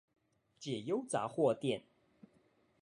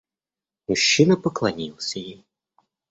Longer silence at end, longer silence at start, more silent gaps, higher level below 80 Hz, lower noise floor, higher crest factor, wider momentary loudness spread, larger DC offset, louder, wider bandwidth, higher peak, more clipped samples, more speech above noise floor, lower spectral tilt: first, 1.05 s vs 0.8 s; about the same, 0.6 s vs 0.7 s; neither; second, -80 dBFS vs -60 dBFS; second, -72 dBFS vs under -90 dBFS; about the same, 20 dB vs 20 dB; second, 10 LU vs 19 LU; neither; second, -37 LUFS vs -21 LUFS; first, 11.5 kHz vs 8.2 kHz; second, -20 dBFS vs -4 dBFS; neither; second, 36 dB vs over 69 dB; first, -5.5 dB/octave vs -4 dB/octave